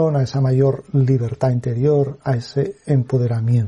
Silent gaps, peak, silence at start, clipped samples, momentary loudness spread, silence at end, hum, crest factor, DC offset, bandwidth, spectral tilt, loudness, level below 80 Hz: none; -4 dBFS; 0 s; under 0.1%; 5 LU; 0 s; none; 12 dB; under 0.1%; 7.6 kHz; -9 dB/octave; -19 LUFS; -50 dBFS